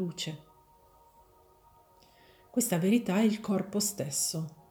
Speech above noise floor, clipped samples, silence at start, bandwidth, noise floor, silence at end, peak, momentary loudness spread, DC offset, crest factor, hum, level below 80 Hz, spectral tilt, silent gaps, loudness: 32 dB; under 0.1%; 0 s; over 20 kHz; -61 dBFS; 0.15 s; -16 dBFS; 11 LU; under 0.1%; 18 dB; none; -70 dBFS; -4.5 dB/octave; none; -30 LUFS